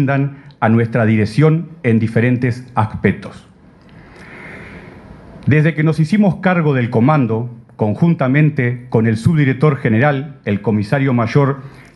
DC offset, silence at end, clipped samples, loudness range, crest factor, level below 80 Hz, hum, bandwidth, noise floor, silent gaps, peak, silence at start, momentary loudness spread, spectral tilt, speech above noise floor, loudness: under 0.1%; 0.25 s; under 0.1%; 5 LU; 16 dB; -48 dBFS; none; 10.5 kHz; -43 dBFS; none; 0 dBFS; 0 s; 10 LU; -9 dB/octave; 29 dB; -15 LUFS